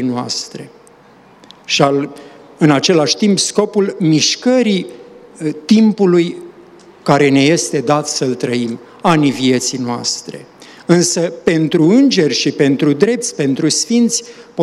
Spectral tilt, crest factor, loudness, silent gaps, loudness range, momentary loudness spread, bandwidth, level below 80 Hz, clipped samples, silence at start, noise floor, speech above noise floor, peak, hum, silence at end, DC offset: -4.5 dB/octave; 14 dB; -14 LUFS; none; 3 LU; 12 LU; 13 kHz; -58 dBFS; under 0.1%; 0 s; -44 dBFS; 31 dB; 0 dBFS; none; 0 s; under 0.1%